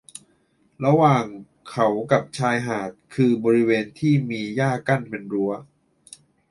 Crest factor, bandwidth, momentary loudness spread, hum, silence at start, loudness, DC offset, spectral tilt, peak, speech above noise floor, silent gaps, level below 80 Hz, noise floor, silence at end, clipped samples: 20 dB; 11.5 kHz; 15 LU; none; 0.8 s; -22 LUFS; under 0.1%; -7 dB/octave; -4 dBFS; 42 dB; none; -62 dBFS; -63 dBFS; 0.9 s; under 0.1%